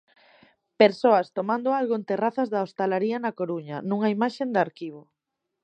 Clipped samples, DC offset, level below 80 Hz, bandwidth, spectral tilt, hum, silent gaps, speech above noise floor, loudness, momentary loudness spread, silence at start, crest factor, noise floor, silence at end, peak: under 0.1%; under 0.1%; -80 dBFS; 8.8 kHz; -7 dB/octave; none; none; 59 dB; -25 LUFS; 9 LU; 0.8 s; 24 dB; -83 dBFS; 0.65 s; -2 dBFS